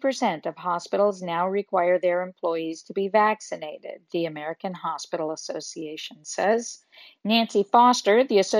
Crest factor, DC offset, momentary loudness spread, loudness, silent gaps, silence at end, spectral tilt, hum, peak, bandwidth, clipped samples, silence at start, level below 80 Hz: 20 dB; under 0.1%; 15 LU; -24 LUFS; none; 0 s; -4 dB/octave; none; -4 dBFS; 13.5 kHz; under 0.1%; 0 s; -76 dBFS